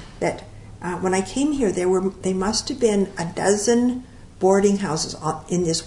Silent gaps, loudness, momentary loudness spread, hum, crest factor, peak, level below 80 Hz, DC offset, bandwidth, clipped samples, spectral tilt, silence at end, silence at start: none; -22 LUFS; 8 LU; none; 18 dB; -4 dBFS; -46 dBFS; under 0.1%; 11 kHz; under 0.1%; -4.5 dB/octave; 0 s; 0 s